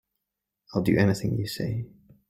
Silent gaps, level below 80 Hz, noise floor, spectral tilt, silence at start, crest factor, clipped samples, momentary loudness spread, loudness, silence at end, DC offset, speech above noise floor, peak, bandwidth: none; -54 dBFS; -85 dBFS; -6.5 dB/octave; 0.7 s; 20 dB; under 0.1%; 11 LU; -27 LUFS; 0.4 s; under 0.1%; 60 dB; -8 dBFS; 16 kHz